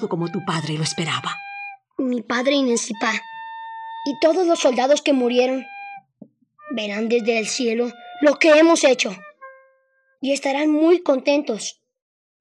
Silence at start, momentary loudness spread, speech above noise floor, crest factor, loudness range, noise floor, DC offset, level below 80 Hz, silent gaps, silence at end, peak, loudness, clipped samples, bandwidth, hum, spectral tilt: 0 s; 16 LU; 45 dB; 18 dB; 5 LU; -64 dBFS; under 0.1%; -80 dBFS; none; 0.7 s; -2 dBFS; -20 LUFS; under 0.1%; 11.5 kHz; none; -4 dB/octave